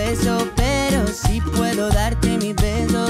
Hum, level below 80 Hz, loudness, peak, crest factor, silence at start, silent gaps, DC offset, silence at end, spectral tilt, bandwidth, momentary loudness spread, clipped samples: none; -24 dBFS; -20 LUFS; -6 dBFS; 14 dB; 0 s; none; under 0.1%; 0 s; -5 dB/octave; 16 kHz; 2 LU; under 0.1%